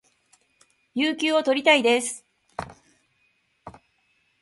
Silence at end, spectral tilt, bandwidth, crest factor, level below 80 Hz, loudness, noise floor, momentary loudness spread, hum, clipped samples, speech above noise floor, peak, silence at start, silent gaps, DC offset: 0.7 s; -2 dB/octave; 11.5 kHz; 22 dB; -64 dBFS; -21 LUFS; -68 dBFS; 21 LU; none; under 0.1%; 47 dB; -4 dBFS; 0.95 s; none; under 0.1%